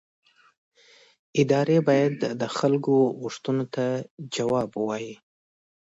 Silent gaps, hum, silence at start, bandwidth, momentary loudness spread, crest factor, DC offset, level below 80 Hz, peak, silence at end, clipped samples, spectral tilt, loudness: 4.11-4.17 s; none; 1.35 s; 8 kHz; 12 LU; 18 dB; under 0.1%; -68 dBFS; -8 dBFS; 0.8 s; under 0.1%; -6.5 dB/octave; -25 LUFS